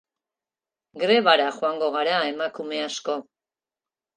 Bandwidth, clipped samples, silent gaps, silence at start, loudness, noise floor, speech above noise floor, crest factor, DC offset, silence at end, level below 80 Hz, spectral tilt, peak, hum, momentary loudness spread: 9.6 kHz; under 0.1%; none; 0.95 s; -23 LUFS; under -90 dBFS; over 67 dB; 24 dB; under 0.1%; 0.95 s; -82 dBFS; -3 dB/octave; -2 dBFS; none; 12 LU